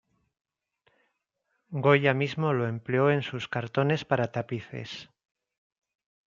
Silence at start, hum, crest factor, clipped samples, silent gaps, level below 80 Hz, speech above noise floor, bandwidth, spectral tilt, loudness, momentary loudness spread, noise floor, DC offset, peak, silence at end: 1.7 s; none; 22 dB; under 0.1%; none; -70 dBFS; 52 dB; 7.4 kHz; -7 dB/octave; -27 LUFS; 16 LU; -79 dBFS; under 0.1%; -6 dBFS; 1.25 s